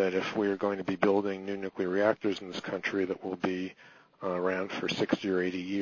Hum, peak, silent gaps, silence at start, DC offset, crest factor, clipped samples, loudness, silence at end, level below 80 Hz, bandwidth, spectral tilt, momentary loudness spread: none; -8 dBFS; none; 0 s; under 0.1%; 22 dB; under 0.1%; -31 LUFS; 0 s; -68 dBFS; 7.4 kHz; -6 dB/octave; 9 LU